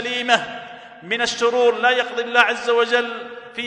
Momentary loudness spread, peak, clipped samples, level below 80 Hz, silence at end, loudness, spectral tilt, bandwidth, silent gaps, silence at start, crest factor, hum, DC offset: 16 LU; 0 dBFS; under 0.1%; -64 dBFS; 0 s; -18 LUFS; -1.5 dB/octave; 10.5 kHz; none; 0 s; 20 dB; none; under 0.1%